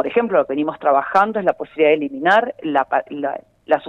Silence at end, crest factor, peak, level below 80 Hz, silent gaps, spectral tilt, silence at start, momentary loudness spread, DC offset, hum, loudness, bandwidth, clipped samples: 0 s; 16 dB; -2 dBFS; -62 dBFS; none; -6.5 dB/octave; 0 s; 8 LU; under 0.1%; none; -18 LUFS; 7.8 kHz; under 0.1%